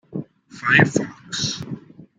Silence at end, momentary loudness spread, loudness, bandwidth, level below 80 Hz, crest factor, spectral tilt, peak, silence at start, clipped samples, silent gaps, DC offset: 0.15 s; 19 LU; -20 LUFS; 9.4 kHz; -58 dBFS; 22 dB; -4 dB/octave; -2 dBFS; 0.1 s; under 0.1%; none; under 0.1%